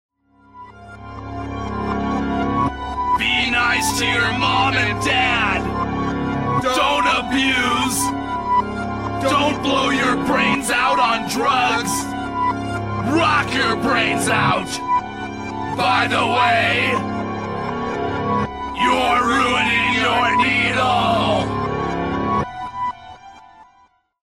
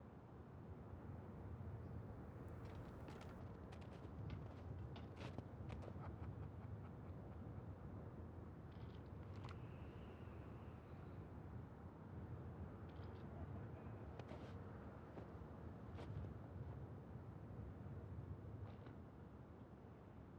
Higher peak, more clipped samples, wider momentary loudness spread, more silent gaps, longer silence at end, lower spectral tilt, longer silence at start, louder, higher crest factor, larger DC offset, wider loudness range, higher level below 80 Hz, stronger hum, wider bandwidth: first, -4 dBFS vs -34 dBFS; neither; first, 9 LU vs 4 LU; neither; first, 0.65 s vs 0 s; second, -4 dB/octave vs -8.5 dB/octave; first, 0.55 s vs 0 s; first, -18 LUFS vs -56 LUFS; about the same, 16 dB vs 20 dB; first, 0.3% vs under 0.1%; about the same, 2 LU vs 2 LU; first, -40 dBFS vs -62 dBFS; neither; first, 16 kHz vs 9.6 kHz